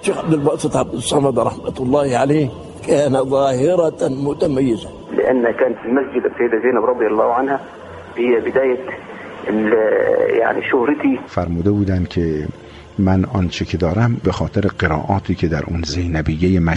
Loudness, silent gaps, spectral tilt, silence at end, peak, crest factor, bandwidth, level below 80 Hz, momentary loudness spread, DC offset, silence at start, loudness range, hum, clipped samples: -17 LUFS; none; -6.5 dB/octave; 0 s; -2 dBFS; 14 dB; 11.5 kHz; -38 dBFS; 8 LU; under 0.1%; 0 s; 2 LU; none; under 0.1%